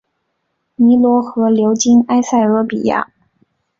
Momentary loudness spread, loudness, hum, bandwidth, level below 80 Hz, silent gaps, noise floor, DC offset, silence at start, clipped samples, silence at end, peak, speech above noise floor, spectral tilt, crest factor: 6 LU; -13 LUFS; none; 7.6 kHz; -56 dBFS; none; -69 dBFS; under 0.1%; 0.8 s; under 0.1%; 0.75 s; -2 dBFS; 57 dB; -5 dB/octave; 12 dB